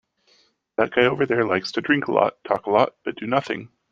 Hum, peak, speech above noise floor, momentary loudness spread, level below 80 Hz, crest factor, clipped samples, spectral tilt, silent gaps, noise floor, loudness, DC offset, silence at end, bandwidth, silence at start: none; -2 dBFS; 40 dB; 11 LU; -62 dBFS; 20 dB; under 0.1%; -6 dB/octave; none; -61 dBFS; -22 LUFS; under 0.1%; 0.25 s; 7.8 kHz; 0.8 s